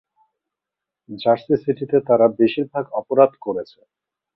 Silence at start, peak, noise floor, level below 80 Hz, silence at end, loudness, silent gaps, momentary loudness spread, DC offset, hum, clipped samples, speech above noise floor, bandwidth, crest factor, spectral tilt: 1.1 s; -2 dBFS; -86 dBFS; -64 dBFS; 0.7 s; -19 LUFS; none; 12 LU; under 0.1%; none; under 0.1%; 67 dB; 5.6 kHz; 18 dB; -10 dB/octave